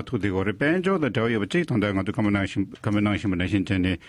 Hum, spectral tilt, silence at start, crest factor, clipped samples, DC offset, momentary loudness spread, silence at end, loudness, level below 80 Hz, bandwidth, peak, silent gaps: none; -7 dB/octave; 0 s; 14 dB; under 0.1%; under 0.1%; 3 LU; 0 s; -24 LUFS; -44 dBFS; 11.5 kHz; -10 dBFS; none